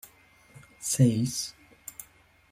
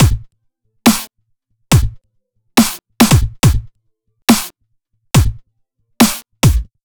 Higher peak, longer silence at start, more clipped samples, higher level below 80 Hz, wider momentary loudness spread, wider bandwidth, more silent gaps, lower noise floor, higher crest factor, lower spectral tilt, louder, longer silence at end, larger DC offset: second, -10 dBFS vs 0 dBFS; first, 0.8 s vs 0 s; neither; second, -62 dBFS vs -24 dBFS; first, 21 LU vs 11 LU; second, 16 kHz vs over 20 kHz; neither; second, -59 dBFS vs -64 dBFS; first, 22 dB vs 16 dB; about the same, -5 dB/octave vs -4.5 dB/octave; second, -27 LUFS vs -14 LUFS; first, 0.5 s vs 0.2 s; neither